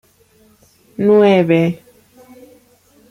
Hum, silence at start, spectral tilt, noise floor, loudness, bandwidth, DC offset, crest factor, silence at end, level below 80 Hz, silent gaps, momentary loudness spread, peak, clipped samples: none; 1 s; -8 dB/octave; -52 dBFS; -13 LUFS; 14.5 kHz; under 0.1%; 16 dB; 1.35 s; -60 dBFS; none; 20 LU; -2 dBFS; under 0.1%